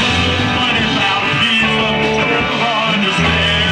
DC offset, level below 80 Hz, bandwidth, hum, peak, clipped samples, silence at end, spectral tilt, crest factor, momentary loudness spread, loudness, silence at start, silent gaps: under 0.1%; -34 dBFS; 12.5 kHz; none; -2 dBFS; under 0.1%; 0 s; -4.5 dB/octave; 12 dB; 2 LU; -13 LUFS; 0 s; none